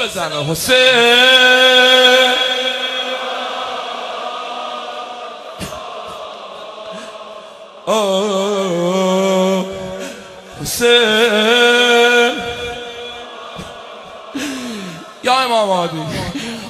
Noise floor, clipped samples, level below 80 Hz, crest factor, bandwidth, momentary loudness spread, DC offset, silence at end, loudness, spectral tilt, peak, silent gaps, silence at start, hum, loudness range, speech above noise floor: -36 dBFS; under 0.1%; -50 dBFS; 16 dB; 14.5 kHz; 22 LU; under 0.1%; 0 s; -13 LUFS; -2.5 dB/octave; 0 dBFS; none; 0 s; none; 16 LU; 24 dB